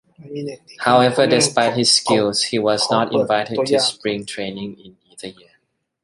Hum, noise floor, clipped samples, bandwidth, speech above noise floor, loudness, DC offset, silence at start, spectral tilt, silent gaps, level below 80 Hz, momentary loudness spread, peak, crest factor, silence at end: none; -65 dBFS; under 0.1%; 11.5 kHz; 47 dB; -17 LUFS; under 0.1%; 0.2 s; -3.5 dB/octave; none; -60 dBFS; 19 LU; -2 dBFS; 18 dB; 0.7 s